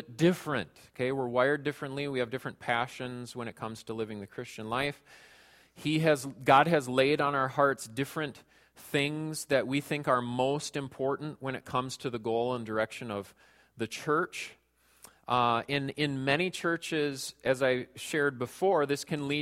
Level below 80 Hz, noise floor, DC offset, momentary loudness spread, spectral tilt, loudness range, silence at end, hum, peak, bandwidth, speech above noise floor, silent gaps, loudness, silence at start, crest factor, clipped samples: -68 dBFS; -59 dBFS; under 0.1%; 12 LU; -5 dB/octave; 7 LU; 0 s; none; -8 dBFS; 16.5 kHz; 28 dB; none; -31 LUFS; 0 s; 24 dB; under 0.1%